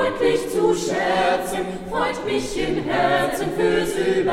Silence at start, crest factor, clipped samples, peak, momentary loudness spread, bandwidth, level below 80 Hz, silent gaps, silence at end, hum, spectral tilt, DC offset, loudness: 0 s; 16 dB; under 0.1%; -6 dBFS; 5 LU; 16.5 kHz; -42 dBFS; none; 0 s; none; -4.5 dB/octave; under 0.1%; -21 LUFS